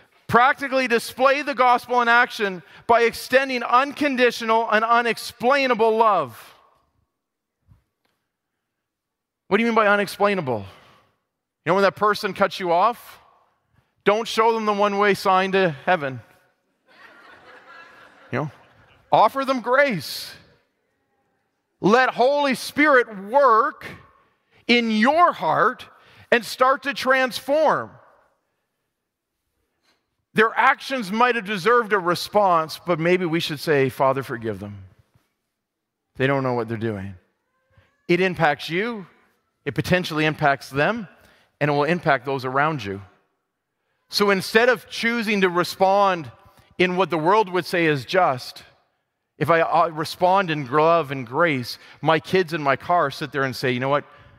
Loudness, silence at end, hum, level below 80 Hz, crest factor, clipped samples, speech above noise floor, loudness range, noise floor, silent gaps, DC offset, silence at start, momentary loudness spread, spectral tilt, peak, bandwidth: -20 LUFS; 0.35 s; none; -62 dBFS; 20 dB; under 0.1%; 62 dB; 6 LU; -82 dBFS; none; under 0.1%; 0.3 s; 11 LU; -5 dB/octave; -2 dBFS; 16 kHz